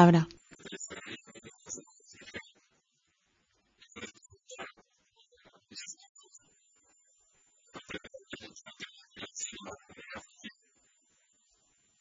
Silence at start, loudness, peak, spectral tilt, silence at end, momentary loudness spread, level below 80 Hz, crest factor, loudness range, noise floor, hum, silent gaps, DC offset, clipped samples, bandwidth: 0 s; -39 LUFS; -6 dBFS; -5.5 dB/octave; 1.5 s; 13 LU; -72 dBFS; 30 dB; 6 LU; -76 dBFS; none; 6.09-6.15 s; under 0.1%; under 0.1%; 7.6 kHz